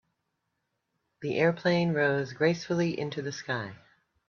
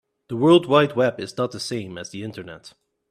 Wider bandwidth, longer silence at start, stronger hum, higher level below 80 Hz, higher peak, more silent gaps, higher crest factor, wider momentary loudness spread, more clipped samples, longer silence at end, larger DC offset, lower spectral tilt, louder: second, 7 kHz vs 13 kHz; first, 1.2 s vs 0.3 s; neither; second, -68 dBFS vs -62 dBFS; second, -12 dBFS vs -2 dBFS; neither; about the same, 20 dB vs 20 dB; second, 9 LU vs 18 LU; neither; first, 0.55 s vs 0.4 s; neither; about the same, -6 dB/octave vs -6 dB/octave; second, -28 LUFS vs -20 LUFS